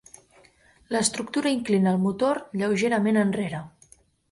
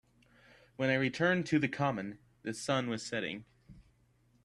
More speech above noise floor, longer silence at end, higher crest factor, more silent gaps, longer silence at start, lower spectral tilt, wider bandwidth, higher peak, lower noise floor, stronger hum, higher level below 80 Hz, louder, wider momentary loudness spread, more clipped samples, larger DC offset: about the same, 34 dB vs 36 dB; about the same, 0.6 s vs 0.65 s; about the same, 18 dB vs 20 dB; neither; about the same, 0.9 s vs 0.8 s; about the same, -5 dB/octave vs -5.5 dB/octave; about the same, 11.5 kHz vs 12.5 kHz; first, -8 dBFS vs -16 dBFS; second, -58 dBFS vs -69 dBFS; neither; about the same, -64 dBFS vs -68 dBFS; first, -24 LUFS vs -33 LUFS; second, 8 LU vs 13 LU; neither; neither